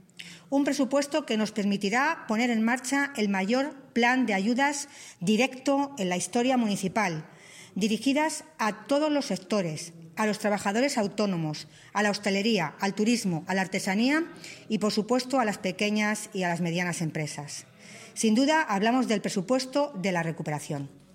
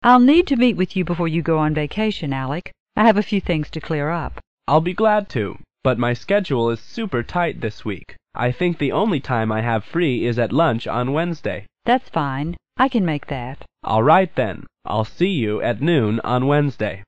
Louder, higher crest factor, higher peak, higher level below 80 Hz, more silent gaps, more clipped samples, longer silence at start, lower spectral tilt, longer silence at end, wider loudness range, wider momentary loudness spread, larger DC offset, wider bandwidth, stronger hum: second, -27 LUFS vs -20 LUFS; about the same, 16 dB vs 16 dB; second, -10 dBFS vs -4 dBFS; second, -74 dBFS vs -44 dBFS; second, none vs 2.80-2.86 s, 4.47-4.57 s; neither; first, 0.2 s vs 0 s; second, -4.5 dB/octave vs -8 dB/octave; first, 0.25 s vs 0 s; about the same, 2 LU vs 3 LU; about the same, 10 LU vs 11 LU; second, under 0.1% vs 1%; first, 16 kHz vs 8.4 kHz; neither